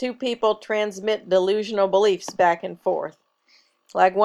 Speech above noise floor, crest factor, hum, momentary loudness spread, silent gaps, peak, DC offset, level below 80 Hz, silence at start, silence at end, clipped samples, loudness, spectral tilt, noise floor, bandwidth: 39 dB; 18 dB; none; 7 LU; none; -4 dBFS; under 0.1%; -72 dBFS; 0 s; 0 s; under 0.1%; -22 LUFS; -4.5 dB/octave; -61 dBFS; 12 kHz